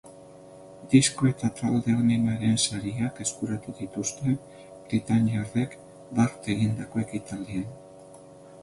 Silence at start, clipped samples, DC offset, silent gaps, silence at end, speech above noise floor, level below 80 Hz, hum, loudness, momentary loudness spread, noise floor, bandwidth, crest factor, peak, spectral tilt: 0.05 s; under 0.1%; under 0.1%; none; 0 s; 22 dB; -56 dBFS; none; -27 LUFS; 12 LU; -48 dBFS; 11.5 kHz; 22 dB; -6 dBFS; -5 dB/octave